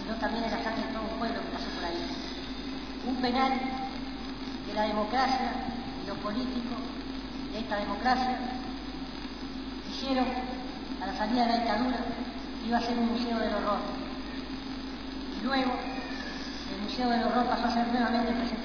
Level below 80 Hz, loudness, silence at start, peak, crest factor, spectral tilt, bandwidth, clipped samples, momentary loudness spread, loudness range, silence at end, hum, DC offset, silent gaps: -48 dBFS; -32 LUFS; 0 s; -14 dBFS; 16 dB; -5 dB/octave; 5.4 kHz; under 0.1%; 10 LU; 3 LU; 0 s; none; 0.4%; none